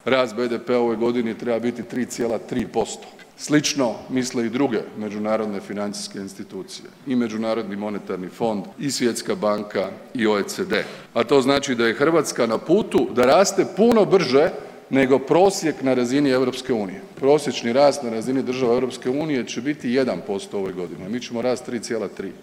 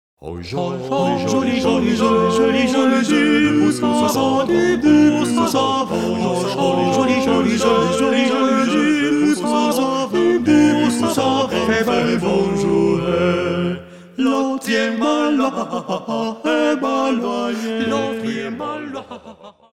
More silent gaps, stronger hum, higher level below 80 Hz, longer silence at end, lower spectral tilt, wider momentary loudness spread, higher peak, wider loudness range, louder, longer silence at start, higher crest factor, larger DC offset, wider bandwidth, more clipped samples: neither; neither; second, -58 dBFS vs -50 dBFS; second, 0 s vs 0.25 s; about the same, -4.5 dB/octave vs -5 dB/octave; first, 12 LU vs 9 LU; about the same, 0 dBFS vs -2 dBFS; first, 8 LU vs 4 LU; second, -22 LUFS vs -17 LUFS; second, 0.05 s vs 0.2 s; first, 22 dB vs 16 dB; second, under 0.1% vs 0.2%; about the same, 16 kHz vs 15 kHz; neither